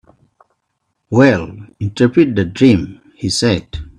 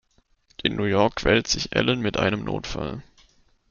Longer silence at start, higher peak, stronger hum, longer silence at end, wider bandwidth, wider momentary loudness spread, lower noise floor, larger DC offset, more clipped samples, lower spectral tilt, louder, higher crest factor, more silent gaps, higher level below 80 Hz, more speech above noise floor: first, 1.1 s vs 0.65 s; first, 0 dBFS vs -4 dBFS; neither; second, 0.1 s vs 0.7 s; first, 11.5 kHz vs 7.4 kHz; about the same, 13 LU vs 11 LU; first, -70 dBFS vs -63 dBFS; neither; neither; first, -6 dB/octave vs -4.5 dB/octave; first, -14 LUFS vs -23 LUFS; second, 16 dB vs 22 dB; neither; about the same, -40 dBFS vs -44 dBFS; first, 57 dB vs 39 dB